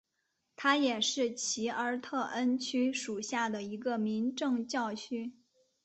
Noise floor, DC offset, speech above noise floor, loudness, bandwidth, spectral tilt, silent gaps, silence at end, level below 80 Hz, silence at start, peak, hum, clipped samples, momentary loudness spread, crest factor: -81 dBFS; under 0.1%; 49 dB; -33 LUFS; 8.4 kHz; -2.5 dB/octave; none; 0.5 s; -78 dBFS; 0.6 s; -14 dBFS; none; under 0.1%; 8 LU; 20 dB